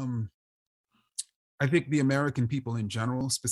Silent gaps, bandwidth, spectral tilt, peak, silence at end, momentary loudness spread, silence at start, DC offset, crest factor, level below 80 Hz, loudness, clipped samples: 0.34-0.84 s, 1.36-1.58 s; 12.5 kHz; -5 dB/octave; -12 dBFS; 0 s; 13 LU; 0 s; under 0.1%; 18 dB; -64 dBFS; -29 LUFS; under 0.1%